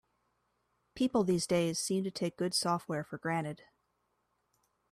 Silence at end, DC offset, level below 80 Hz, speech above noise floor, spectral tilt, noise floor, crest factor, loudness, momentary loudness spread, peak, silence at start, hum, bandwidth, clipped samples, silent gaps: 1.35 s; under 0.1%; -70 dBFS; 46 dB; -4.5 dB/octave; -79 dBFS; 18 dB; -33 LUFS; 7 LU; -18 dBFS; 0.95 s; none; 15 kHz; under 0.1%; none